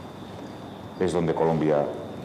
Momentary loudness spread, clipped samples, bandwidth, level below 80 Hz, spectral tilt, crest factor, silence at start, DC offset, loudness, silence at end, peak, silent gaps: 16 LU; under 0.1%; 13.5 kHz; -56 dBFS; -7 dB/octave; 16 dB; 0 s; under 0.1%; -25 LUFS; 0 s; -10 dBFS; none